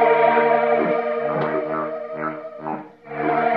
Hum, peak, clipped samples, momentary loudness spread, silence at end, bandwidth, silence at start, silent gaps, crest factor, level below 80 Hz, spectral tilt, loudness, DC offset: none; -4 dBFS; under 0.1%; 15 LU; 0 s; 5.2 kHz; 0 s; none; 16 dB; -64 dBFS; -8.5 dB/octave; -21 LUFS; under 0.1%